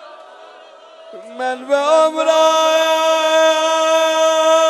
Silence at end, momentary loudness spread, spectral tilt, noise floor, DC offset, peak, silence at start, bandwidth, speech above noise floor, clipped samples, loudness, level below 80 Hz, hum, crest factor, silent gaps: 0 s; 10 LU; 0.5 dB/octave; -41 dBFS; under 0.1%; -2 dBFS; 0 s; 13 kHz; 26 dB; under 0.1%; -14 LUFS; -86 dBFS; none; 14 dB; none